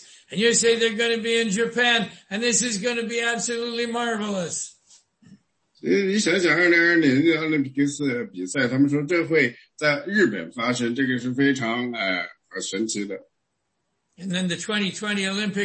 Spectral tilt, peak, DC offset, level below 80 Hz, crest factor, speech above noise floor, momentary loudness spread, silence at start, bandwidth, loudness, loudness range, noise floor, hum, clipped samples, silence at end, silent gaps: -3.5 dB/octave; -6 dBFS; under 0.1%; -68 dBFS; 16 dB; 54 dB; 11 LU; 0.3 s; 8.8 kHz; -22 LUFS; 7 LU; -77 dBFS; none; under 0.1%; 0 s; none